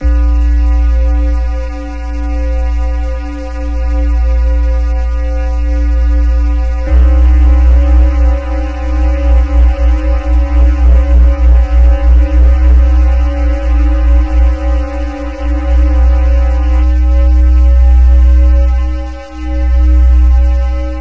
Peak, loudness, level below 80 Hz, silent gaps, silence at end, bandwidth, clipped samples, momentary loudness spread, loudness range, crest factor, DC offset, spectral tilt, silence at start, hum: 0 dBFS; -11 LUFS; -8 dBFS; none; 0 s; 3.2 kHz; under 0.1%; 9 LU; 5 LU; 8 dB; 0.6%; -8.5 dB/octave; 0 s; none